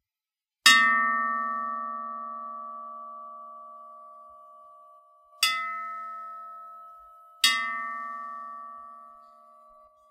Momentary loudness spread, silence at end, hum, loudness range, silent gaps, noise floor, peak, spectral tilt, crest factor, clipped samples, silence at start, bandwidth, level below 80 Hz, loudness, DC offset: 26 LU; 0.85 s; none; 14 LU; none; under -90 dBFS; -2 dBFS; 2 dB/octave; 28 dB; under 0.1%; 0.65 s; 16 kHz; -74 dBFS; -25 LUFS; under 0.1%